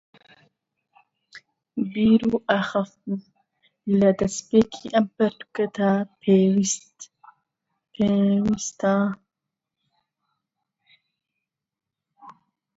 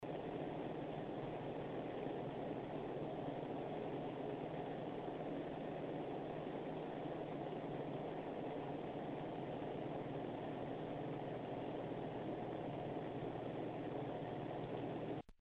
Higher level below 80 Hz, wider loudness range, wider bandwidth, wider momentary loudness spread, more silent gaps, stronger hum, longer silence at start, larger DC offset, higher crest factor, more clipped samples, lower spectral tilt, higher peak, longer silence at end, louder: first, -58 dBFS vs -70 dBFS; first, 5 LU vs 0 LU; second, 8 kHz vs 9 kHz; first, 13 LU vs 1 LU; neither; neither; first, 1.35 s vs 0 s; neither; first, 20 dB vs 14 dB; neither; second, -5.5 dB/octave vs -9 dB/octave; first, -4 dBFS vs -30 dBFS; first, 0.45 s vs 0.1 s; first, -22 LUFS vs -46 LUFS